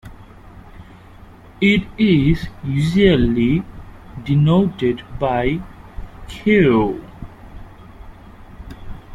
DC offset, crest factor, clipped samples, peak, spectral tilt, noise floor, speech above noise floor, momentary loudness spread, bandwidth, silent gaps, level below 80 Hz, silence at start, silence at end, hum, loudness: under 0.1%; 18 dB; under 0.1%; -2 dBFS; -8 dB/octave; -41 dBFS; 25 dB; 24 LU; 11.5 kHz; none; -36 dBFS; 0.05 s; 0 s; none; -17 LUFS